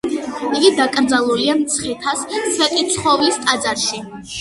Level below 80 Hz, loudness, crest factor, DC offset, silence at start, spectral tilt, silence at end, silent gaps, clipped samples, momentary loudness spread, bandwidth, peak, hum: -52 dBFS; -17 LUFS; 18 dB; under 0.1%; 0.05 s; -2 dB/octave; 0 s; none; under 0.1%; 7 LU; 12 kHz; 0 dBFS; none